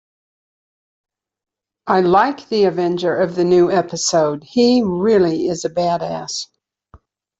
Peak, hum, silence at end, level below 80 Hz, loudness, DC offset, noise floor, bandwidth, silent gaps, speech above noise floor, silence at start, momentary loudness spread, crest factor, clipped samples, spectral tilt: -2 dBFS; none; 0.95 s; -56 dBFS; -17 LUFS; under 0.1%; -50 dBFS; 8 kHz; none; 34 dB; 1.85 s; 9 LU; 16 dB; under 0.1%; -5 dB/octave